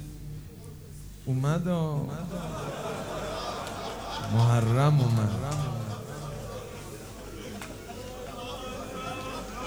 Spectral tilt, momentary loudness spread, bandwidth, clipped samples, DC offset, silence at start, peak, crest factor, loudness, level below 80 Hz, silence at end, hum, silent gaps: -6.5 dB/octave; 18 LU; over 20 kHz; under 0.1%; under 0.1%; 0 s; -10 dBFS; 20 dB; -30 LUFS; -48 dBFS; 0 s; none; none